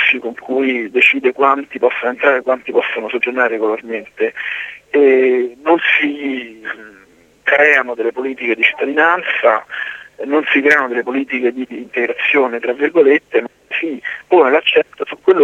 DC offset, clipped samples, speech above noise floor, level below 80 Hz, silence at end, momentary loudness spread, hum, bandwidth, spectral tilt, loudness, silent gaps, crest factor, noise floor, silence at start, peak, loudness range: under 0.1%; under 0.1%; 20 dB; -66 dBFS; 0 s; 12 LU; 50 Hz at -65 dBFS; 8.2 kHz; -4.5 dB/octave; -15 LUFS; none; 16 dB; -35 dBFS; 0 s; 0 dBFS; 2 LU